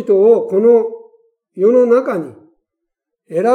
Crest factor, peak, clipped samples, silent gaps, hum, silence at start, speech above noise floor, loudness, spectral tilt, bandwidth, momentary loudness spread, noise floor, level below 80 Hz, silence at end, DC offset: 14 dB; 0 dBFS; under 0.1%; none; none; 0 s; 66 dB; -13 LUFS; -8 dB/octave; 9.6 kHz; 13 LU; -78 dBFS; -78 dBFS; 0 s; under 0.1%